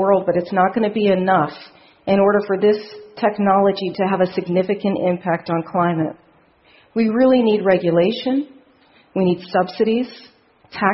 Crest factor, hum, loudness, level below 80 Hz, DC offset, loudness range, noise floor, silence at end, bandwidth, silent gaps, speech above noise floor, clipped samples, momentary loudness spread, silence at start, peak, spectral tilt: 18 dB; none; -18 LUFS; -60 dBFS; under 0.1%; 3 LU; -54 dBFS; 0 s; 5.8 kHz; none; 36 dB; under 0.1%; 9 LU; 0 s; 0 dBFS; -11 dB/octave